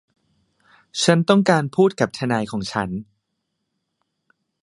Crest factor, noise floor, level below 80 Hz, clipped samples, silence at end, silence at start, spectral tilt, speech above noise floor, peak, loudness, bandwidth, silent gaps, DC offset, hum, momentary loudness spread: 22 dB; -76 dBFS; -58 dBFS; under 0.1%; 1.6 s; 0.95 s; -5.5 dB/octave; 57 dB; 0 dBFS; -20 LUFS; 11.5 kHz; none; under 0.1%; none; 12 LU